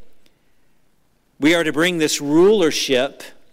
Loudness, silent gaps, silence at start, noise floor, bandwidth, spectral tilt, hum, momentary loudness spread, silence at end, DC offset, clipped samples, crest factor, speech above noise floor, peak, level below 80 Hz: -17 LUFS; none; 0 s; -62 dBFS; 16 kHz; -3.5 dB/octave; none; 6 LU; 0.25 s; under 0.1%; under 0.1%; 12 dB; 46 dB; -8 dBFS; -56 dBFS